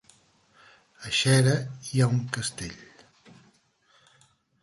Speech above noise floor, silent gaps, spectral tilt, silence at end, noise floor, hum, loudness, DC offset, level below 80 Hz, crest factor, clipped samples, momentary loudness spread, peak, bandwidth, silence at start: 40 dB; none; -4.5 dB/octave; 1.8 s; -64 dBFS; none; -25 LUFS; under 0.1%; -60 dBFS; 20 dB; under 0.1%; 19 LU; -8 dBFS; 11.5 kHz; 1 s